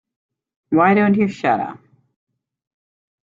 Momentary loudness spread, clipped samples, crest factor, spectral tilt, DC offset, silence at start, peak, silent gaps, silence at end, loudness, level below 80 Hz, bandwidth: 8 LU; under 0.1%; 18 dB; -8 dB/octave; under 0.1%; 0.7 s; -4 dBFS; none; 1.6 s; -17 LUFS; -64 dBFS; 7.4 kHz